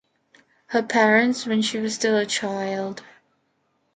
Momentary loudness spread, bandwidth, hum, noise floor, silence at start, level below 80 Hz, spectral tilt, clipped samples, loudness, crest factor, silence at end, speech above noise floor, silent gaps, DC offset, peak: 11 LU; 9.4 kHz; none; -70 dBFS; 0.7 s; -72 dBFS; -3.5 dB/octave; under 0.1%; -22 LUFS; 18 dB; 0.95 s; 48 dB; none; under 0.1%; -6 dBFS